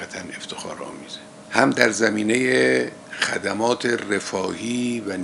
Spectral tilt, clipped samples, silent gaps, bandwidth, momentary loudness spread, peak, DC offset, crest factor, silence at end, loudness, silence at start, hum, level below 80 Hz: -3.5 dB/octave; under 0.1%; none; 11.5 kHz; 16 LU; 0 dBFS; under 0.1%; 22 dB; 0 s; -21 LUFS; 0 s; none; -66 dBFS